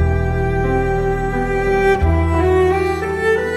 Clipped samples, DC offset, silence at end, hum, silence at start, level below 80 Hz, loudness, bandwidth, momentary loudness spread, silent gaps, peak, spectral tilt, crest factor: under 0.1%; under 0.1%; 0 s; none; 0 s; -24 dBFS; -17 LUFS; 12.5 kHz; 4 LU; none; -4 dBFS; -7.5 dB/octave; 12 dB